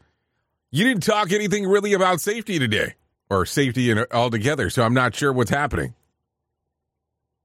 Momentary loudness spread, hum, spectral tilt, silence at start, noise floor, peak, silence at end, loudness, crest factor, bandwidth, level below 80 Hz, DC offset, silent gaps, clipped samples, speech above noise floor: 6 LU; none; -5 dB/octave; 0.75 s; -80 dBFS; -6 dBFS; 1.5 s; -21 LUFS; 16 dB; 16 kHz; -48 dBFS; under 0.1%; none; under 0.1%; 60 dB